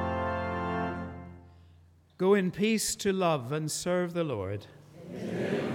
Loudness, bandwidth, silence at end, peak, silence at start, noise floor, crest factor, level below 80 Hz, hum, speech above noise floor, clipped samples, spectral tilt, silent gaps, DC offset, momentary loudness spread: -30 LUFS; 17.5 kHz; 0 s; -14 dBFS; 0 s; -59 dBFS; 18 dB; -62 dBFS; none; 30 dB; under 0.1%; -5 dB/octave; none; under 0.1%; 16 LU